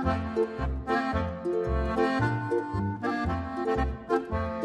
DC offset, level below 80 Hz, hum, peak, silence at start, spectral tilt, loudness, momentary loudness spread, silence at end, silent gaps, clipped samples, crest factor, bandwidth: under 0.1%; -36 dBFS; none; -12 dBFS; 0 s; -8 dB/octave; -29 LUFS; 4 LU; 0 s; none; under 0.1%; 16 dB; 10.5 kHz